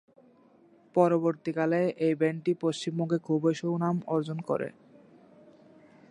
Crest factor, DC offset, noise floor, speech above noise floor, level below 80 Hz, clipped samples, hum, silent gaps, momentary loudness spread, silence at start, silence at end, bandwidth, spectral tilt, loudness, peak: 20 dB; under 0.1%; -60 dBFS; 32 dB; -80 dBFS; under 0.1%; none; none; 7 LU; 0.95 s; 1.4 s; 10.5 kHz; -7 dB/octave; -29 LUFS; -10 dBFS